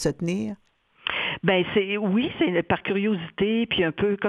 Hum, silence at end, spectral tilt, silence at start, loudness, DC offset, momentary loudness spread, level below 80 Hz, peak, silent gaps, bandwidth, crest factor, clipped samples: none; 0 s; -5.5 dB/octave; 0 s; -24 LUFS; under 0.1%; 7 LU; -54 dBFS; -6 dBFS; none; 11.5 kHz; 18 dB; under 0.1%